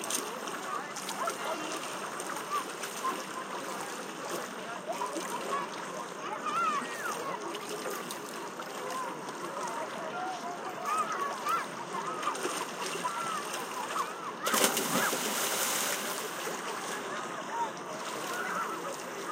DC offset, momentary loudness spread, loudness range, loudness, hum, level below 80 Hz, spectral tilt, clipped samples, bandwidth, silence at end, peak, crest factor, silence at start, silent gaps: under 0.1%; 9 LU; 6 LU; -34 LUFS; none; -88 dBFS; -1.5 dB/octave; under 0.1%; 16.5 kHz; 0 s; -10 dBFS; 26 dB; 0 s; none